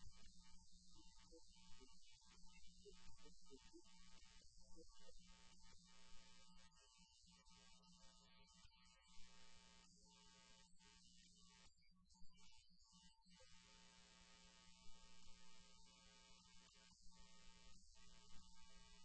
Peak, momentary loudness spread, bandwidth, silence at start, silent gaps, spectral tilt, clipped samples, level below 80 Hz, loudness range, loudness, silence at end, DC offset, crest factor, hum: -44 dBFS; 2 LU; 8.2 kHz; 0 s; none; -2.5 dB/octave; under 0.1%; -74 dBFS; 1 LU; -69 LUFS; 0 s; under 0.1%; 18 dB; none